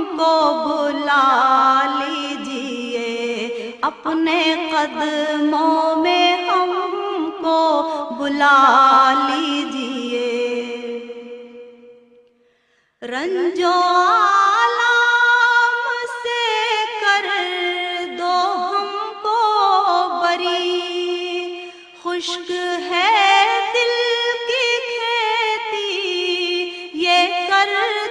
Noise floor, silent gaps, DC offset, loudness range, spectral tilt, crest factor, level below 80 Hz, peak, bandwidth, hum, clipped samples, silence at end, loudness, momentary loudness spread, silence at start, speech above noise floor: -62 dBFS; none; under 0.1%; 6 LU; -1.5 dB/octave; 18 dB; -68 dBFS; 0 dBFS; 10.5 kHz; none; under 0.1%; 0 s; -17 LUFS; 11 LU; 0 s; 46 dB